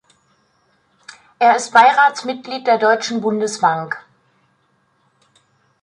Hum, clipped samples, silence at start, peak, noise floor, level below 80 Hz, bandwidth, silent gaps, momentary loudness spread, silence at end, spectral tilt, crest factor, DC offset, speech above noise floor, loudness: none; under 0.1%; 1.4 s; -2 dBFS; -62 dBFS; -72 dBFS; 11 kHz; none; 14 LU; 1.85 s; -3 dB/octave; 18 dB; under 0.1%; 47 dB; -16 LUFS